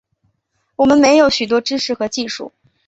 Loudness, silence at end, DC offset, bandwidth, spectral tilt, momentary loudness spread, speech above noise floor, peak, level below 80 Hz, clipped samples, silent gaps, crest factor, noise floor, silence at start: -15 LUFS; 0.4 s; under 0.1%; 8 kHz; -3 dB/octave; 18 LU; 53 dB; 0 dBFS; -52 dBFS; under 0.1%; none; 16 dB; -67 dBFS; 0.8 s